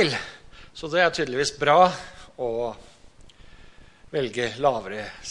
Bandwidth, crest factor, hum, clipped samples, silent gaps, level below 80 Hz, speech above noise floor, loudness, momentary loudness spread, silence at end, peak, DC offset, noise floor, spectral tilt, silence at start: 11.5 kHz; 22 dB; none; under 0.1%; none; -52 dBFS; 26 dB; -24 LUFS; 20 LU; 0 s; -4 dBFS; under 0.1%; -49 dBFS; -4 dB/octave; 0 s